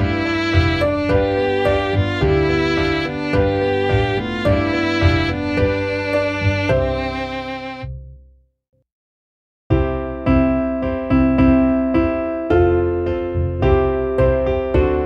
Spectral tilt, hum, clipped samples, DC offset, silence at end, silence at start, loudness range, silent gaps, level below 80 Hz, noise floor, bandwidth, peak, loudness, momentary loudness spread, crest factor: -7.5 dB/octave; none; under 0.1%; under 0.1%; 0 s; 0 s; 6 LU; 8.92-9.70 s; -28 dBFS; -50 dBFS; 9 kHz; -2 dBFS; -18 LUFS; 6 LU; 16 dB